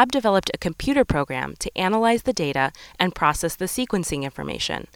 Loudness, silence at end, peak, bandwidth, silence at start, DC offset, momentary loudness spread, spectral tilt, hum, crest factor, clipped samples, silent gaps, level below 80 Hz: -23 LUFS; 0.1 s; 0 dBFS; 19 kHz; 0 s; under 0.1%; 7 LU; -4 dB/octave; none; 22 dB; under 0.1%; none; -42 dBFS